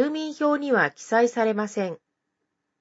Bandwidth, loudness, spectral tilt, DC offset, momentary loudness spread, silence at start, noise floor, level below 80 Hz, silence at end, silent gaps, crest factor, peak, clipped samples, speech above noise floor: 8 kHz; -24 LUFS; -5 dB/octave; under 0.1%; 9 LU; 0 s; -79 dBFS; -80 dBFS; 0.85 s; none; 18 dB; -6 dBFS; under 0.1%; 56 dB